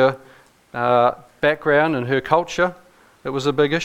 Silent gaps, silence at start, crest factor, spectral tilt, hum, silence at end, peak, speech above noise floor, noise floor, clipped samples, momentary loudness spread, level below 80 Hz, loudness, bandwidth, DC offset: none; 0 s; 18 dB; -5.5 dB/octave; none; 0 s; -2 dBFS; 32 dB; -50 dBFS; under 0.1%; 11 LU; -52 dBFS; -20 LUFS; 14.5 kHz; under 0.1%